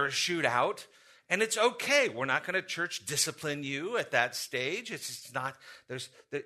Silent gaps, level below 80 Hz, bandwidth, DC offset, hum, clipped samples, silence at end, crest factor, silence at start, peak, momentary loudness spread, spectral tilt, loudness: none; -78 dBFS; 13.5 kHz; under 0.1%; none; under 0.1%; 0 s; 22 dB; 0 s; -10 dBFS; 14 LU; -2 dB/octave; -30 LUFS